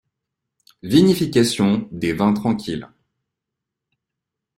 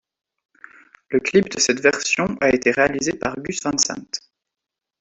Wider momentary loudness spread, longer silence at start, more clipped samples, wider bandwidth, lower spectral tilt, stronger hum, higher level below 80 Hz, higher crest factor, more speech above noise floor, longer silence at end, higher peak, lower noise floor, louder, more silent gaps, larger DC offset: first, 13 LU vs 9 LU; second, 0.85 s vs 1.1 s; neither; first, 16 kHz vs 8.4 kHz; first, -6 dB/octave vs -3 dB/octave; neither; about the same, -54 dBFS vs -54 dBFS; about the same, 20 dB vs 20 dB; about the same, 65 dB vs 65 dB; first, 1.7 s vs 0.85 s; about the same, -2 dBFS vs -2 dBFS; about the same, -83 dBFS vs -85 dBFS; about the same, -18 LUFS vs -19 LUFS; neither; neither